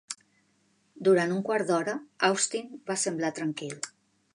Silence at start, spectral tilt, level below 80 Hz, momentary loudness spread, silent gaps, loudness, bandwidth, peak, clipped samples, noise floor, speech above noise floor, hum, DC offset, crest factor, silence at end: 0.1 s; -3.5 dB/octave; -82 dBFS; 14 LU; none; -28 LUFS; 11.5 kHz; -10 dBFS; under 0.1%; -69 dBFS; 41 dB; none; under 0.1%; 20 dB; 0.45 s